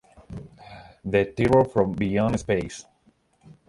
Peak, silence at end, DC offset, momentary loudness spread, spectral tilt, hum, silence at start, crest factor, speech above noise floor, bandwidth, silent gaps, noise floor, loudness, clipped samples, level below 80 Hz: -6 dBFS; 0.85 s; under 0.1%; 23 LU; -7 dB/octave; none; 0.3 s; 20 dB; 41 dB; 11.5 kHz; none; -63 dBFS; -23 LUFS; under 0.1%; -46 dBFS